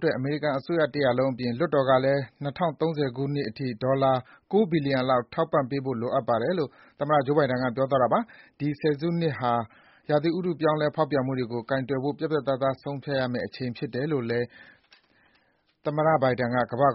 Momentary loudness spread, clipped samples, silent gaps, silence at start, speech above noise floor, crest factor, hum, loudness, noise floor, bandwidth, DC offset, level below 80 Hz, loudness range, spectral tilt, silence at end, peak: 8 LU; under 0.1%; none; 0 s; 41 dB; 18 dB; none; -26 LUFS; -67 dBFS; 5.8 kHz; under 0.1%; -62 dBFS; 3 LU; -5.5 dB/octave; 0 s; -8 dBFS